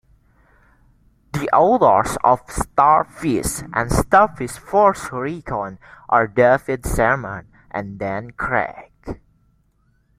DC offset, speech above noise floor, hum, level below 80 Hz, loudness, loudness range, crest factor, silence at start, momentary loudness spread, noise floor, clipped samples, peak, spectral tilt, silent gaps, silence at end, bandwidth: under 0.1%; 43 dB; none; -38 dBFS; -18 LUFS; 4 LU; 18 dB; 1.35 s; 16 LU; -61 dBFS; under 0.1%; -2 dBFS; -5.5 dB/octave; none; 1 s; 16 kHz